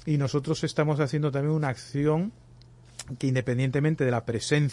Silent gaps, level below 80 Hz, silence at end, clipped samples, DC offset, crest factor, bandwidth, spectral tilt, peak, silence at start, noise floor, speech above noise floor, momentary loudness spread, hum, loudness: none; -56 dBFS; 0 s; under 0.1%; under 0.1%; 16 dB; 11.5 kHz; -6.5 dB/octave; -10 dBFS; 0 s; -52 dBFS; 26 dB; 6 LU; none; -27 LUFS